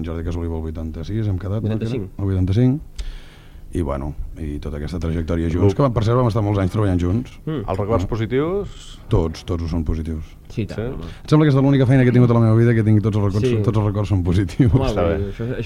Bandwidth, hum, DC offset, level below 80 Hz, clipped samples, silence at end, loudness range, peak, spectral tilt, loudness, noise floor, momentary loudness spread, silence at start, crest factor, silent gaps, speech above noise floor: 10.5 kHz; none; under 0.1%; -32 dBFS; under 0.1%; 0 s; 7 LU; -2 dBFS; -8.5 dB/octave; -20 LUFS; -39 dBFS; 14 LU; 0 s; 16 dB; none; 20 dB